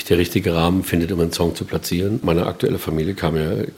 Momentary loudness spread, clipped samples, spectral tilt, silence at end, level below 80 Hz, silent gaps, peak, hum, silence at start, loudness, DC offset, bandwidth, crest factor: 4 LU; under 0.1%; -6 dB/octave; 0 s; -42 dBFS; none; -2 dBFS; none; 0 s; -20 LUFS; under 0.1%; 17 kHz; 18 dB